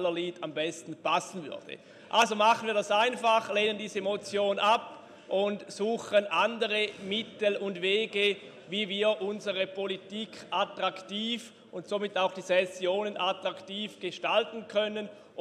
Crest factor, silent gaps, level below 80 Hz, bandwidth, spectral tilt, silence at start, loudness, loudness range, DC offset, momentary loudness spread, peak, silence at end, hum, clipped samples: 20 dB; none; -82 dBFS; 13 kHz; -3.5 dB/octave; 0 s; -30 LUFS; 4 LU; under 0.1%; 11 LU; -10 dBFS; 0 s; none; under 0.1%